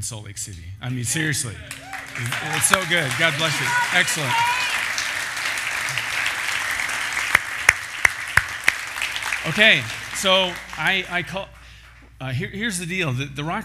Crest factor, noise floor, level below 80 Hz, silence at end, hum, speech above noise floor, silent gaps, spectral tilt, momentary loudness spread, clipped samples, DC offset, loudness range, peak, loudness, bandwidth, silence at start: 22 dB; -45 dBFS; -50 dBFS; 0 s; none; 23 dB; none; -2 dB/octave; 13 LU; under 0.1%; under 0.1%; 4 LU; 0 dBFS; -21 LUFS; 16 kHz; 0 s